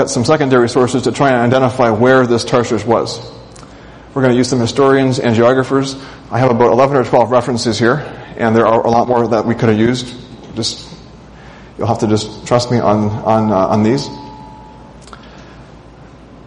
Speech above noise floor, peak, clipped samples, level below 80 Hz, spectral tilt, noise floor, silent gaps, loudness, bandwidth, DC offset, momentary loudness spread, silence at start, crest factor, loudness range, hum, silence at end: 25 dB; 0 dBFS; under 0.1%; -44 dBFS; -6 dB/octave; -37 dBFS; none; -13 LUFS; 10.5 kHz; under 0.1%; 15 LU; 0 s; 14 dB; 5 LU; none; 0.05 s